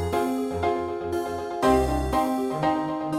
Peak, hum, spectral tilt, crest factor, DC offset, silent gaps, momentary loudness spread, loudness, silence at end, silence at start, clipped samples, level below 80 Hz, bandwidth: -8 dBFS; none; -6 dB/octave; 16 dB; under 0.1%; none; 7 LU; -25 LUFS; 0 s; 0 s; under 0.1%; -38 dBFS; 16 kHz